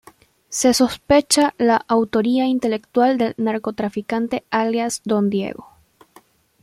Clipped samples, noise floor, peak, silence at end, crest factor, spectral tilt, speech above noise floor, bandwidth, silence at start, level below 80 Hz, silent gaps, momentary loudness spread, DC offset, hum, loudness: under 0.1%; -53 dBFS; -2 dBFS; 1 s; 18 dB; -4 dB/octave; 34 dB; 16 kHz; 0.5 s; -52 dBFS; none; 8 LU; under 0.1%; none; -19 LUFS